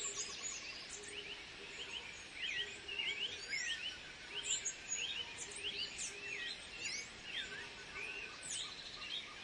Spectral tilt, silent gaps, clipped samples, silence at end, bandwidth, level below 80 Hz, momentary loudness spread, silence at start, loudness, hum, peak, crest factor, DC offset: 0.5 dB/octave; none; under 0.1%; 0 s; 11.5 kHz; -70 dBFS; 8 LU; 0 s; -42 LUFS; none; -26 dBFS; 20 dB; under 0.1%